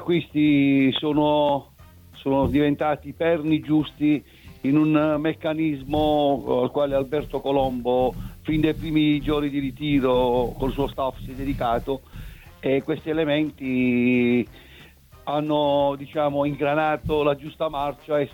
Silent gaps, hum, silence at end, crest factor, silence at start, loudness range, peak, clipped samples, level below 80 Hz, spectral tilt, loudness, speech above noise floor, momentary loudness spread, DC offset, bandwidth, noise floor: none; none; 0.05 s; 16 dB; 0 s; 3 LU; -8 dBFS; under 0.1%; -42 dBFS; -8 dB/octave; -23 LUFS; 26 dB; 8 LU; under 0.1%; 16.5 kHz; -48 dBFS